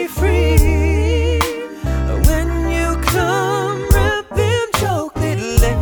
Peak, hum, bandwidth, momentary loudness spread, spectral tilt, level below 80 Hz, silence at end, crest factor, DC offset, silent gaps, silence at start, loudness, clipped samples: 0 dBFS; none; over 20 kHz; 6 LU; -5.5 dB/octave; -20 dBFS; 0 s; 16 dB; under 0.1%; none; 0 s; -17 LUFS; under 0.1%